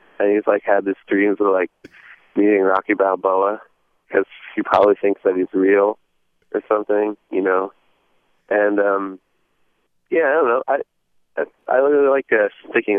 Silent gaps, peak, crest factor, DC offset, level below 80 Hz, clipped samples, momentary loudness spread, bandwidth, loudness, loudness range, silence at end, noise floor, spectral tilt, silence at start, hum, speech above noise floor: none; 0 dBFS; 18 dB; under 0.1%; -68 dBFS; under 0.1%; 12 LU; 4.7 kHz; -18 LUFS; 3 LU; 0 s; -64 dBFS; -8 dB/octave; 0.2 s; none; 47 dB